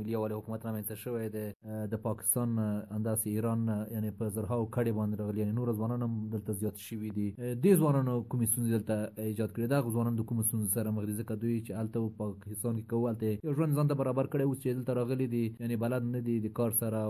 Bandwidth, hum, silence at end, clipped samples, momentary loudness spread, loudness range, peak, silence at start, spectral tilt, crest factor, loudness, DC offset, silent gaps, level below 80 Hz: 14.5 kHz; none; 0 s; under 0.1%; 7 LU; 3 LU; -14 dBFS; 0 s; -7 dB/octave; 18 dB; -33 LUFS; under 0.1%; 1.55-1.60 s; -62 dBFS